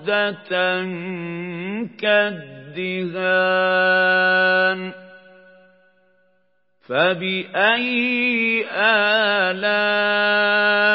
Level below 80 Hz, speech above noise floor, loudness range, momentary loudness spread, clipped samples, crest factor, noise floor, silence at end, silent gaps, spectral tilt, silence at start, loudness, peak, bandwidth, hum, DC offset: -80 dBFS; 48 dB; 5 LU; 13 LU; under 0.1%; 18 dB; -67 dBFS; 0 s; none; -9 dB/octave; 0 s; -18 LUFS; -2 dBFS; 5.8 kHz; none; under 0.1%